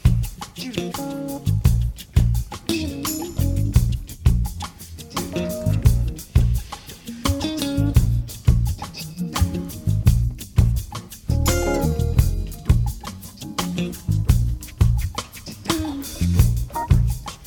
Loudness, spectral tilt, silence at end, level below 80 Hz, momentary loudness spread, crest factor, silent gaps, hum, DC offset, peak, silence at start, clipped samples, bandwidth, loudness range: -23 LUFS; -6 dB/octave; 0 s; -24 dBFS; 11 LU; 18 dB; none; none; under 0.1%; -2 dBFS; 0.05 s; under 0.1%; 19 kHz; 2 LU